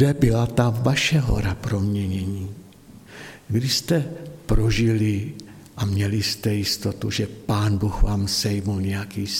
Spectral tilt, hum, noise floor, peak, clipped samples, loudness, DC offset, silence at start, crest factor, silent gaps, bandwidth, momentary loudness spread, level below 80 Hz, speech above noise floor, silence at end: -5.5 dB/octave; none; -46 dBFS; -4 dBFS; under 0.1%; -23 LUFS; under 0.1%; 0 s; 18 dB; none; 16.5 kHz; 15 LU; -32 dBFS; 24 dB; 0 s